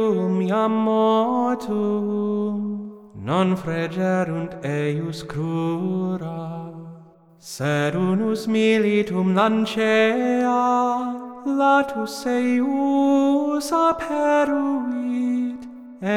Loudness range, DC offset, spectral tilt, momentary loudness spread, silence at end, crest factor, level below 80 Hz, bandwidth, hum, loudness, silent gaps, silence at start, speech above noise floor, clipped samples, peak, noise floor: 6 LU; under 0.1%; -6.5 dB/octave; 11 LU; 0 s; 16 dB; -60 dBFS; 15 kHz; none; -21 LUFS; none; 0 s; 26 dB; under 0.1%; -6 dBFS; -47 dBFS